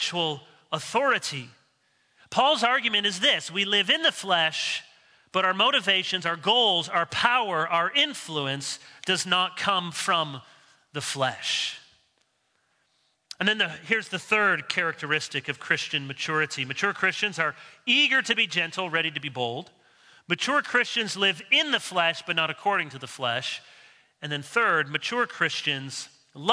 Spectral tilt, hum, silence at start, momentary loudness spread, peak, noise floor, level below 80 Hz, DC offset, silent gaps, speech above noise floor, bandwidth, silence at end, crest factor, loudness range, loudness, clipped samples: -2.5 dB/octave; none; 0 s; 12 LU; -4 dBFS; -71 dBFS; -76 dBFS; under 0.1%; none; 45 dB; 11 kHz; 0 s; 22 dB; 4 LU; -24 LUFS; under 0.1%